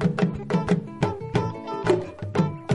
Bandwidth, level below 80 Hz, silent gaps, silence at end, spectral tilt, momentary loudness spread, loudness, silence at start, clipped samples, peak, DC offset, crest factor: 11 kHz; -48 dBFS; none; 0 s; -7.5 dB/octave; 4 LU; -26 LUFS; 0 s; under 0.1%; -8 dBFS; under 0.1%; 18 dB